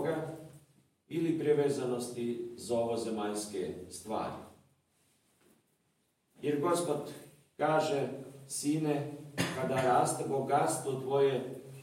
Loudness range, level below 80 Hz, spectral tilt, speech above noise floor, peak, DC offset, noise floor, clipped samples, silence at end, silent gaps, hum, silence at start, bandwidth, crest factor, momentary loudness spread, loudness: 8 LU; -76 dBFS; -5 dB/octave; 44 dB; -16 dBFS; under 0.1%; -76 dBFS; under 0.1%; 0 s; none; none; 0 s; 16.5 kHz; 18 dB; 11 LU; -33 LUFS